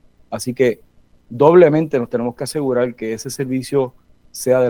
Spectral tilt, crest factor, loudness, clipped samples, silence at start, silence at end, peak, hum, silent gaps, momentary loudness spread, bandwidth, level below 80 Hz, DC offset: -6 dB/octave; 18 dB; -17 LUFS; under 0.1%; 0.3 s; 0 s; 0 dBFS; none; none; 16 LU; 18.5 kHz; -54 dBFS; under 0.1%